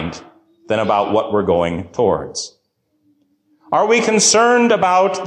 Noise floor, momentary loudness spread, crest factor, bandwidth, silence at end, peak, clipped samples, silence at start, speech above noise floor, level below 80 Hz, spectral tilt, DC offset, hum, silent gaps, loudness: -66 dBFS; 15 LU; 14 dB; 12.5 kHz; 0 s; -4 dBFS; under 0.1%; 0 s; 51 dB; -46 dBFS; -3 dB/octave; under 0.1%; none; none; -15 LUFS